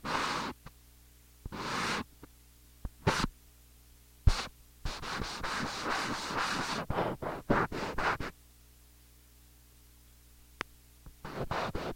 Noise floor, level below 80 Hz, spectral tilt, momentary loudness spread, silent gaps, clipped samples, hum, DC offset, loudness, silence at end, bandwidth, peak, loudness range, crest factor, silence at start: -59 dBFS; -44 dBFS; -4.5 dB/octave; 16 LU; none; under 0.1%; 60 Hz at -55 dBFS; under 0.1%; -35 LUFS; 0 s; 16.5 kHz; -10 dBFS; 8 LU; 28 dB; 0 s